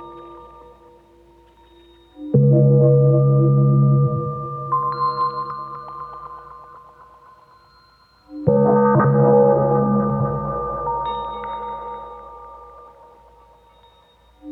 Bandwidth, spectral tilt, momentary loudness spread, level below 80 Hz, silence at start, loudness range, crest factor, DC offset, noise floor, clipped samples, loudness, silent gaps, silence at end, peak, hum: 4.4 kHz; -12 dB/octave; 24 LU; -48 dBFS; 0 s; 14 LU; 18 dB; under 0.1%; -53 dBFS; under 0.1%; -18 LUFS; none; 0 s; -2 dBFS; none